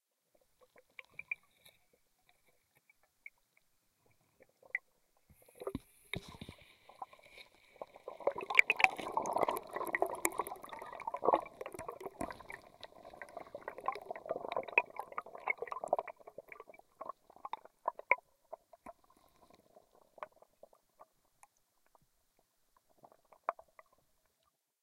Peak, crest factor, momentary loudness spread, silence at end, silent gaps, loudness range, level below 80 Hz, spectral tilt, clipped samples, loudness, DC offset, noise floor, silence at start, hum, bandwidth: -6 dBFS; 36 dB; 23 LU; 1.3 s; none; 19 LU; -72 dBFS; -2.5 dB/octave; under 0.1%; -37 LUFS; under 0.1%; -81 dBFS; 1.2 s; none; 16 kHz